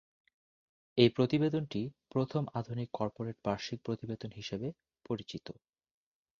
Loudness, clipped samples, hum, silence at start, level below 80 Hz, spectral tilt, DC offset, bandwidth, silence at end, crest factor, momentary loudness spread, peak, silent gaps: -35 LUFS; under 0.1%; none; 0.95 s; -66 dBFS; -7 dB/octave; under 0.1%; 7.2 kHz; 0.9 s; 26 dB; 13 LU; -8 dBFS; none